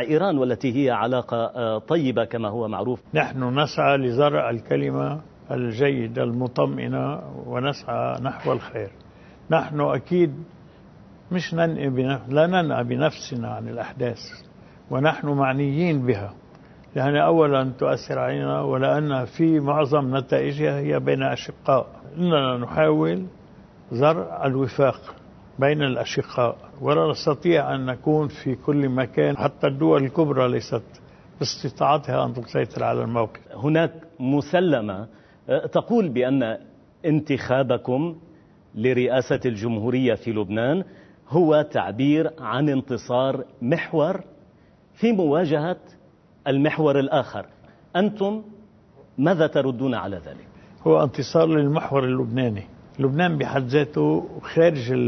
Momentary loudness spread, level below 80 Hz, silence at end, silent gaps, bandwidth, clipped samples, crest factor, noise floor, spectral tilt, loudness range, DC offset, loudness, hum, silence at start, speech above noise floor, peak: 10 LU; -58 dBFS; 0 s; none; 6.4 kHz; under 0.1%; 18 dB; -54 dBFS; -7.5 dB/octave; 3 LU; under 0.1%; -23 LUFS; none; 0 s; 32 dB; -4 dBFS